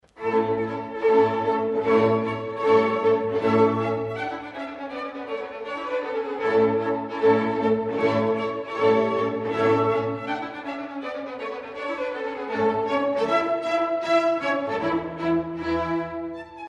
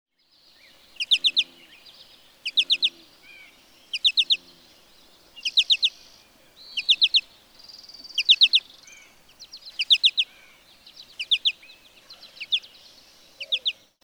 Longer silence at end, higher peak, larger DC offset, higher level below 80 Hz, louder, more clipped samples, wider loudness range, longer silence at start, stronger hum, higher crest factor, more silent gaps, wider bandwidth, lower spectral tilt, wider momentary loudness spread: second, 0 s vs 0.3 s; about the same, -6 dBFS vs -6 dBFS; neither; first, -58 dBFS vs -72 dBFS; second, -24 LUFS vs -21 LUFS; neither; about the same, 5 LU vs 3 LU; second, 0.15 s vs 1 s; neither; about the same, 18 dB vs 22 dB; neither; second, 7.8 kHz vs over 20 kHz; first, -7 dB/octave vs 2.5 dB/octave; second, 12 LU vs 22 LU